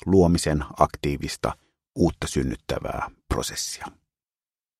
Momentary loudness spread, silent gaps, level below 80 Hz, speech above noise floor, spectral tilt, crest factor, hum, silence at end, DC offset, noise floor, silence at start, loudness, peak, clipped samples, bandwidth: 13 LU; none; -38 dBFS; over 66 dB; -5.5 dB/octave; 22 dB; none; 0.9 s; under 0.1%; under -90 dBFS; 0.05 s; -25 LUFS; -2 dBFS; under 0.1%; 15 kHz